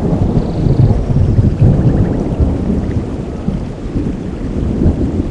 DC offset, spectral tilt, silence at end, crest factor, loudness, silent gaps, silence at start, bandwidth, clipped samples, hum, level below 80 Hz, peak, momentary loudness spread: 0.2%; -10 dB/octave; 0 s; 12 dB; -15 LUFS; none; 0 s; 9 kHz; under 0.1%; none; -20 dBFS; 0 dBFS; 9 LU